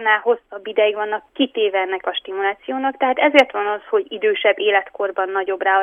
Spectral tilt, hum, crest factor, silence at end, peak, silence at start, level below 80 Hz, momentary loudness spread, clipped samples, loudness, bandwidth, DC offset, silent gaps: -3.5 dB/octave; none; 18 dB; 0 s; 0 dBFS; 0 s; -66 dBFS; 9 LU; under 0.1%; -19 LUFS; 8.4 kHz; under 0.1%; none